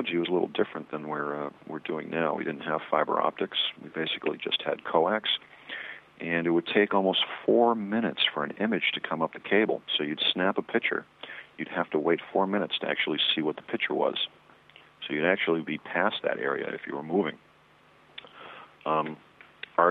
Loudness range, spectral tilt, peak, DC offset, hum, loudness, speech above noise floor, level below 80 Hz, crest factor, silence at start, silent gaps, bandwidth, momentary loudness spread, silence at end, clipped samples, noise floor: 4 LU; -7 dB/octave; -8 dBFS; under 0.1%; none; -28 LUFS; 31 dB; -76 dBFS; 22 dB; 0 s; none; 5 kHz; 13 LU; 0 s; under 0.1%; -59 dBFS